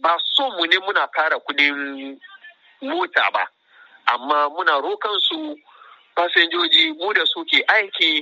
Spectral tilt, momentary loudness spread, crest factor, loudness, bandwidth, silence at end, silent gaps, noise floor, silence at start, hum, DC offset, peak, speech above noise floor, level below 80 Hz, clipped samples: 4.5 dB/octave; 13 LU; 20 dB; -18 LUFS; 8 kHz; 0 s; none; -51 dBFS; 0.05 s; none; under 0.1%; 0 dBFS; 31 dB; -82 dBFS; under 0.1%